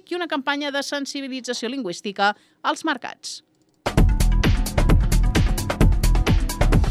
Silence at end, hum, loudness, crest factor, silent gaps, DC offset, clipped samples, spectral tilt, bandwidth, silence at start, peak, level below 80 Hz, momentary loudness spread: 0 s; none; -23 LUFS; 14 dB; none; under 0.1%; under 0.1%; -5 dB/octave; 15 kHz; 0.1 s; -6 dBFS; -22 dBFS; 9 LU